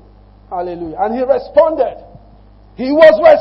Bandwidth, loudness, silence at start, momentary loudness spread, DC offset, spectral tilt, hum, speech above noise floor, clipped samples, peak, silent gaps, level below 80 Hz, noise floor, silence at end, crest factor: 5.8 kHz; -13 LUFS; 0.5 s; 17 LU; under 0.1%; -6.5 dB/octave; 50 Hz at -45 dBFS; 31 dB; 0.4%; 0 dBFS; none; -44 dBFS; -42 dBFS; 0 s; 14 dB